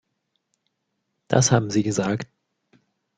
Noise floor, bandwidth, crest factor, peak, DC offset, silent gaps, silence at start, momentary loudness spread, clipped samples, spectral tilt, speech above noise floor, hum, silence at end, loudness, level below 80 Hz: -77 dBFS; 9.4 kHz; 24 dB; -2 dBFS; under 0.1%; none; 1.3 s; 11 LU; under 0.1%; -5 dB/octave; 56 dB; none; 0.95 s; -22 LUFS; -58 dBFS